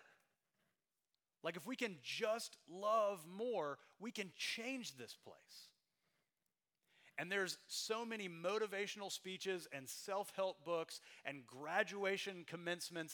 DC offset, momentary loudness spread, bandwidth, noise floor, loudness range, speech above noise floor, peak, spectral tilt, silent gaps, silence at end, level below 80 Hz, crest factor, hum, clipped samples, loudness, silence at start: under 0.1%; 11 LU; 19.5 kHz; under -90 dBFS; 5 LU; over 45 dB; -22 dBFS; -3 dB/octave; none; 0 s; under -90 dBFS; 24 dB; none; under 0.1%; -44 LUFS; 0 s